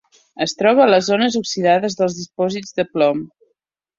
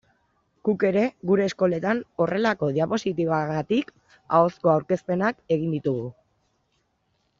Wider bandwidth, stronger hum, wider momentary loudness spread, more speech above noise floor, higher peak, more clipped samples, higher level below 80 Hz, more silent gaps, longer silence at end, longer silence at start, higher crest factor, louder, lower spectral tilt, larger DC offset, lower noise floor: about the same, 7.8 kHz vs 7.6 kHz; neither; first, 10 LU vs 6 LU; first, 55 dB vs 48 dB; first, -2 dBFS vs -6 dBFS; neither; about the same, -62 dBFS vs -64 dBFS; neither; second, 0.75 s vs 1.3 s; second, 0.35 s vs 0.65 s; about the same, 16 dB vs 20 dB; first, -17 LUFS vs -24 LUFS; second, -4.5 dB/octave vs -6 dB/octave; neither; about the same, -72 dBFS vs -71 dBFS